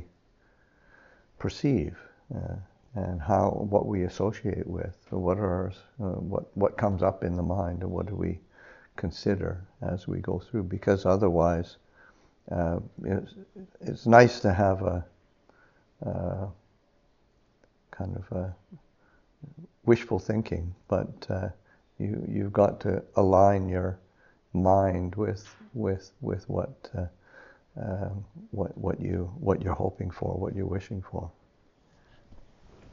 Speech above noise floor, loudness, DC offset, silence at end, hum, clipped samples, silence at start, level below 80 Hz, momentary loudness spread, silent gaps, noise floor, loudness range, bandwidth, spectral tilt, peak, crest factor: 38 dB; -29 LUFS; under 0.1%; 0.5 s; none; under 0.1%; 0 s; -50 dBFS; 15 LU; none; -66 dBFS; 10 LU; 7.2 kHz; -7 dB/octave; -4 dBFS; 26 dB